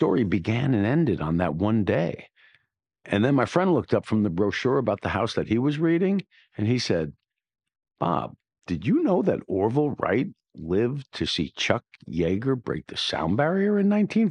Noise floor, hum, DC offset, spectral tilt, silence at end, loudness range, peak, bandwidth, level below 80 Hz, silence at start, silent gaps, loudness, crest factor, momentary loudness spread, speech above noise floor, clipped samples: -71 dBFS; none; under 0.1%; -7 dB/octave; 0 s; 3 LU; -4 dBFS; 10 kHz; -56 dBFS; 0 s; none; -25 LUFS; 20 dB; 8 LU; 48 dB; under 0.1%